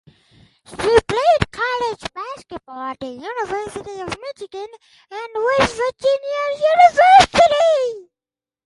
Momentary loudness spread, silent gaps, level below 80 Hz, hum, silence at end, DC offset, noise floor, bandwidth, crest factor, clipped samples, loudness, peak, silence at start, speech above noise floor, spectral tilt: 22 LU; none; -44 dBFS; none; 0.65 s; under 0.1%; under -90 dBFS; 11.5 kHz; 18 dB; under 0.1%; -16 LUFS; 0 dBFS; 0.7 s; over 73 dB; -3.5 dB/octave